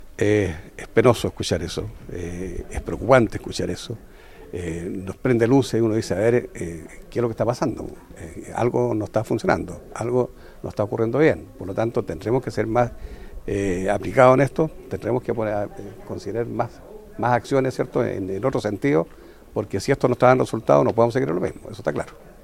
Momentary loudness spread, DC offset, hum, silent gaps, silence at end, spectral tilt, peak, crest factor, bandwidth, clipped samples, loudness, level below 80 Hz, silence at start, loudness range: 16 LU; under 0.1%; none; none; 0.1 s; -6.5 dB/octave; 0 dBFS; 22 dB; 16 kHz; under 0.1%; -22 LUFS; -44 dBFS; 0 s; 4 LU